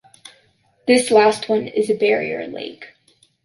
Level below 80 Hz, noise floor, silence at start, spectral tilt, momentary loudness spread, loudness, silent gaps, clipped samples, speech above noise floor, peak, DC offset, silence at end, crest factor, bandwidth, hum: -66 dBFS; -59 dBFS; 0.85 s; -3.5 dB/octave; 16 LU; -18 LUFS; none; under 0.1%; 42 dB; -2 dBFS; under 0.1%; 0.6 s; 18 dB; 11.5 kHz; none